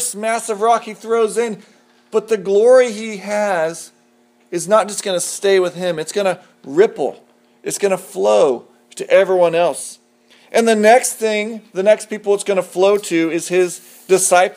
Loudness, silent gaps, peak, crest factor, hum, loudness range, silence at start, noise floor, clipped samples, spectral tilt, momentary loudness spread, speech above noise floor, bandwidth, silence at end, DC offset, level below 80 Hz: -16 LUFS; none; 0 dBFS; 16 dB; none; 3 LU; 0 s; -55 dBFS; under 0.1%; -3.5 dB/octave; 13 LU; 39 dB; 15.5 kHz; 0.05 s; under 0.1%; -76 dBFS